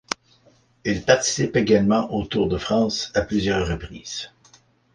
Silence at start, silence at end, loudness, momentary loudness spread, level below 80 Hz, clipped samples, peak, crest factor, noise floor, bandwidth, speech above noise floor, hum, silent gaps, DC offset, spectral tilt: 0.85 s; 0.65 s; -22 LUFS; 13 LU; -42 dBFS; under 0.1%; -2 dBFS; 20 dB; -58 dBFS; 10 kHz; 37 dB; none; none; under 0.1%; -4.5 dB/octave